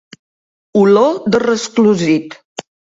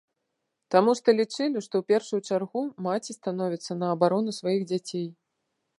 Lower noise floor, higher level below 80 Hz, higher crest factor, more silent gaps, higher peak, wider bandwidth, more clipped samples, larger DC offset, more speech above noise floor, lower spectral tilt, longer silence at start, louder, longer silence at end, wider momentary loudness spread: first, under -90 dBFS vs -81 dBFS; first, -58 dBFS vs -80 dBFS; second, 14 dB vs 22 dB; first, 2.45-2.56 s vs none; first, 0 dBFS vs -6 dBFS; second, 7.8 kHz vs 11.5 kHz; neither; neither; first, over 78 dB vs 55 dB; about the same, -5.5 dB/octave vs -5.5 dB/octave; about the same, 0.75 s vs 0.7 s; first, -13 LUFS vs -27 LUFS; second, 0.35 s vs 0.65 s; first, 20 LU vs 9 LU